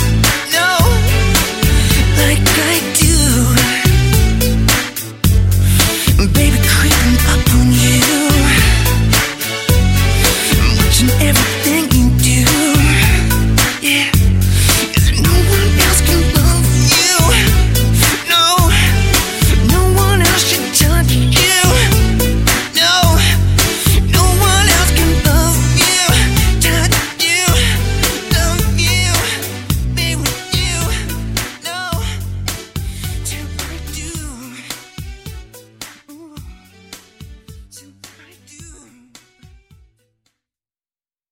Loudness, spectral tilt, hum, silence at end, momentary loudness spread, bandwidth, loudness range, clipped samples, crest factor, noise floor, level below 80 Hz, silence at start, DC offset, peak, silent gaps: -12 LUFS; -3.5 dB/octave; none; 2.6 s; 12 LU; 16.5 kHz; 11 LU; under 0.1%; 12 dB; under -90 dBFS; -18 dBFS; 0 s; under 0.1%; 0 dBFS; none